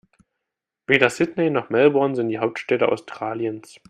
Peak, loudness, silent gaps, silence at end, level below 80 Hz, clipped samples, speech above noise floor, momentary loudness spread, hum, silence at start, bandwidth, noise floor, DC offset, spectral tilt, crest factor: 0 dBFS; -21 LUFS; none; 0.3 s; -66 dBFS; under 0.1%; 63 dB; 11 LU; none; 0.9 s; 12 kHz; -84 dBFS; under 0.1%; -5.5 dB/octave; 22 dB